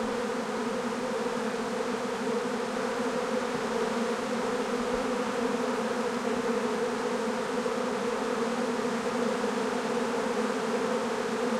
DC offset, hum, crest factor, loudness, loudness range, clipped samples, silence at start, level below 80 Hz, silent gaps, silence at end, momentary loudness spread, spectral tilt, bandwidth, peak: under 0.1%; none; 14 dB; -30 LUFS; 1 LU; under 0.1%; 0 s; -62 dBFS; none; 0 s; 2 LU; -4 dB/octave; 15 kHz; -16 dBFS